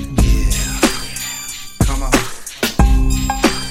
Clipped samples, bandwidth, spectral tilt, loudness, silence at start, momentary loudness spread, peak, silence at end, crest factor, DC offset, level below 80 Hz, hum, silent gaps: under 0.1%; 16.5 kHz; -4 dB/octave; -18 LUFS; 0 s; 8 LU; 0 dBFS; 0 s; 14 dB; under 0.1%; -18 dBFS; none; none